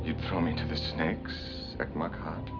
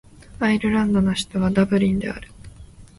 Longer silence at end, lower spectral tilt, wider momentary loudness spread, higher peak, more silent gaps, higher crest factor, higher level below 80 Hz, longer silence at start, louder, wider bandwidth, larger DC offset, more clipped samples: second, 0 s vs 0.15 s; about the same, -7 dB/octave vs -6.5 dB/octave; about the same, 7 LU vs 7 LU; second, -16 dBFS vs -4 dBFS; neither; about the same, 18 dB vs 18 dB; about the same, -44 dBFS vs -42 dBFS; second, 0 s vs 0.3 s; second, -33 LUFS vs -21 LUFS; second, 5.4 kHz vs 11.5 kHz; neither; neither